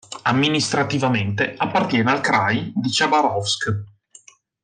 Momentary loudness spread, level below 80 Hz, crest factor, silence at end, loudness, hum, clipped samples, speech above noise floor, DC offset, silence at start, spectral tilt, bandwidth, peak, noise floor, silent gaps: 5 LU; -60 dBFS; 16 dB; 0.75 s; -20 LUFS; none; under 0.1%; 30 dB; under 0.1%; 0.1 s; -4.5 dB/octave; 10 kHz; -6 dBFS; -50 dBFS; none